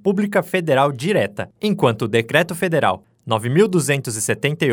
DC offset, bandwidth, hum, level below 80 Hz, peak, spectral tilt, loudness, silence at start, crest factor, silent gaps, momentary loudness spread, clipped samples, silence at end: under 0.1%; over 20 kHz; none; -62 dBFS; -2 dBFS; -5 dB/octave; -19 LUFS; 0.05 s; 18 dB; none; 6 LU; under 0.1%; 0 s